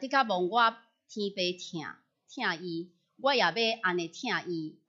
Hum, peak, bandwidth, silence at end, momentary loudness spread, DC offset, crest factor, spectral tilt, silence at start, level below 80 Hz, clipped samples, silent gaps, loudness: none; -10 dBFS; 7.8 kHz; 0.15 s; 15 LU; under 0.1%; 20 dB; -4 dB/octave; 0 s; -86 dBFS; under 0.1%; none; -30 LUFS